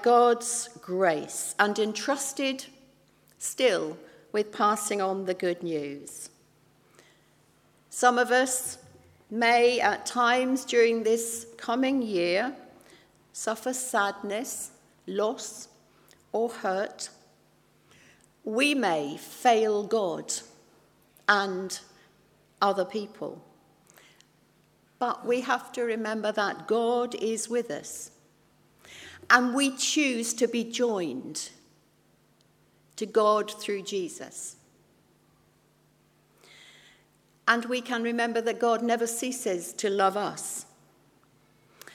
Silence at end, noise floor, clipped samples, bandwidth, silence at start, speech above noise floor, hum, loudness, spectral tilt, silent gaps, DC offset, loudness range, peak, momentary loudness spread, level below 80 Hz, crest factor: 0.05 s; -64 dBFS; under 0.1%; 16 kHz; 0 s; 37 dB; none; -27 LUFS; -2.5 dB/octave; none; under 0.1%; 8 LU; -2 dBFS; 15 LU; -76 dBFS; 26 dB